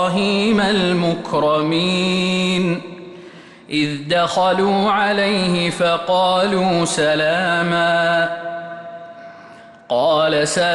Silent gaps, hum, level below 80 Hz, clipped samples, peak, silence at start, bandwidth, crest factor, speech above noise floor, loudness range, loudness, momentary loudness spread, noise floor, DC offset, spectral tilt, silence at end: none; none; -54 dBFS; under 0.1%; -6 dBFS; 0 s; 11.5 kHz; 12 dB; 24 dB; 3 LU; -17 LUFS; 13 LU; -41 dBFS; under 0.1%; -4.5 dB/octave; 0 s